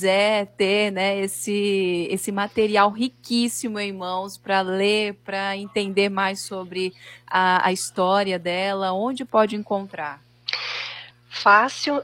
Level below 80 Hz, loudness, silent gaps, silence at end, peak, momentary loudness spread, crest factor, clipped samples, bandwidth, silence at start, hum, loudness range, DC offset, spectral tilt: -66 dBFS; -22 LUFS; none; 0 s; -2 dBFS; 10 LU; 20 dB; under 0.1%; 16.5 kHz; 0 s; none; 2 LU; under 0.1%; -3.5 dB/octave